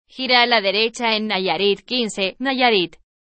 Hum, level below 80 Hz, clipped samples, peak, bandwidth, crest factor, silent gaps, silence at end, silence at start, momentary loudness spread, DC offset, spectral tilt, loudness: none; -60 dBFS; under 0.1%; 0 dBFS; 8.8 kHz; 20 dB; none; 0.35 s; 0.15 s; 7 LU; under 0.1%; -3 dB/octave; -18 LUFS